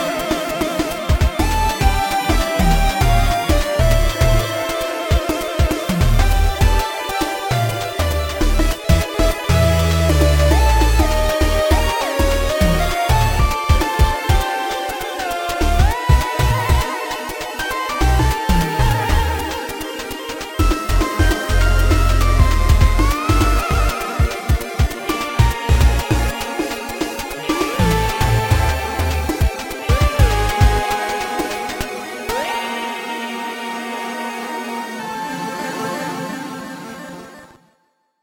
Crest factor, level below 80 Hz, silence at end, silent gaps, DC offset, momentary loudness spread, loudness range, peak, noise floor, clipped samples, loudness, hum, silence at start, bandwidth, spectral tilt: 16 dB; -20 dBFS; 0.75 s; none; under 0.1%; 9 LU; 8 LU; 0 dBFS; -64 dBFS; under 0.1%; -18 LUFS; none; 0 s; 17 kHz; -5 dB/octave